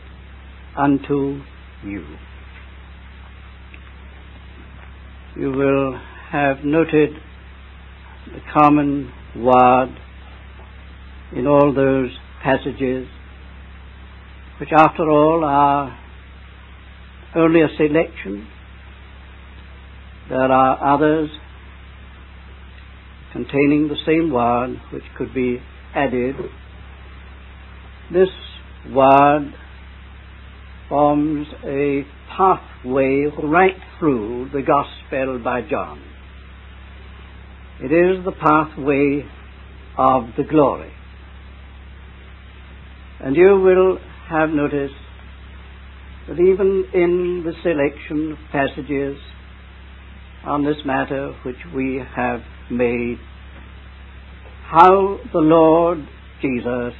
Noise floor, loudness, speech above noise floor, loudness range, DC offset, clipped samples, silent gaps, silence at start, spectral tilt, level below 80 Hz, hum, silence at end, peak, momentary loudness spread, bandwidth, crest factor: -40 dBFS; -18 LUFS; 23 dB; 7 LU; under 0.1%; under 0.1%; none; 0 s; -9.5 dB/octave; -40 dBFS; none; 0 s; 0 dBFS; 26 LU; 4.4 kHz; 20 dB